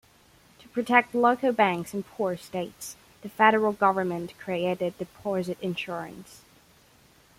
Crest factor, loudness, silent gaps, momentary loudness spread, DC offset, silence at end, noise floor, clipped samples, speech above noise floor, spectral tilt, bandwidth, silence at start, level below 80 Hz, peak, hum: 22 dB; -26 LUFS; none; 16 LU; under 0.1%; 1.05 s; -58 dBFS; under 0.1%; 32 dB; -5 dB/octave; 16.5 kHz; 0.75 s; -66 dBFS; -6 dBFS; none